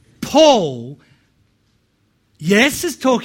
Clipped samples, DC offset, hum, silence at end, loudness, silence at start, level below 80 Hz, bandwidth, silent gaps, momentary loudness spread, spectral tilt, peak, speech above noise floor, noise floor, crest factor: under 0.1%; under 0.1%; none; 0 s; -15 LUFS; 0.2 s; -52 dBFS; 16.5 kHz; none; 18 LU; -4 dB/octave; 0 dBFS; 48 dB; -62 dBFS; 18 dB